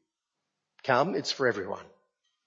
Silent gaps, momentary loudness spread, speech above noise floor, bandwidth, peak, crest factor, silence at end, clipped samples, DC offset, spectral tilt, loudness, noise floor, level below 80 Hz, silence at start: none; 12 LU; 57 dB; 8 kHz; -10 dBFS; 22 dB; 0.65 s; under 0.1%; under 0.1%; -4.5 dB/octave; -29 LUFS; -85 dBFS; -80 dBFS; 0.85 s